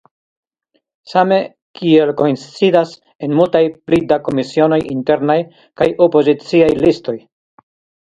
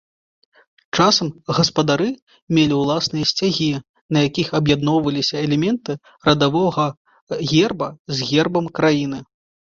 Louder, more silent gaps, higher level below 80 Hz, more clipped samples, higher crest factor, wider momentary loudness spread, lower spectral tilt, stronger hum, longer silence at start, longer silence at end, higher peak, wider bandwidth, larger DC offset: first, -14 LUFS vs -19 LUFS; second, 1.62-1.74 s, 3.15-3.19 s vs 2.22-2.27 s, 2.42-2.47 s, 3.89-3.94 s, 4.01-4.09 s, 6.97-7.05 s, 7.21-7.27 s, 7.99-8.05 s; about the same, -50 dBFS vs -52 dBFS; neither; about the same, 14 dB vs 18 dB; about the same, 10 LU vs 9 LU; first, -7 dB/octave vs -5 dB/octave; neither; first, 1.1 s vs 0.95 s; first, 0.95 s vs 0.5 s; about the same, 0 dBFS vs -2 dBFS; first, 9.2 kHz vs 7.6 kHz; neither